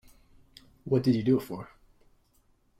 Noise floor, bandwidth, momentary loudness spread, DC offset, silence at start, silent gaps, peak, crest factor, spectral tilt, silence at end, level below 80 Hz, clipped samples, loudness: -67 dBFS; 15 kHz; 22 LU; under 0.1%; 0.85 s; none; -14 dBFS; 18 dB; -8.5 dB/octave; 1.15 s; -60 dBFS; under 0.1%; -27 LUFS